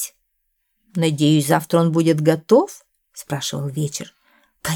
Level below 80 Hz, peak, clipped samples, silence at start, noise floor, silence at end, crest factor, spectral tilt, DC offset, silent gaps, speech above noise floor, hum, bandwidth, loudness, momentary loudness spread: -60 dBFS; -2 dBFS; under 0.1%; 0 s; -71 dBFS; 0 s; 18 dB; -5.5 dB/octave; under 0.1%; none; 53 dB; none; 19 kHz; -19 LUFS; 14 LU